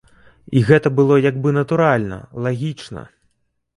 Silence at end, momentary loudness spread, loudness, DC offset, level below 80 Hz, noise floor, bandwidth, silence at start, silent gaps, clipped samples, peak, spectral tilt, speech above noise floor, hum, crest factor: 0.75 s; 15 LU; -17 LUFS; under 0.1%; -50 dBFS; -67 dBFS; 11 kHz; 0.5 s; none; under 0.1%; 0 dBFS; -8 dB/octave; 50 dB; none; 18 dB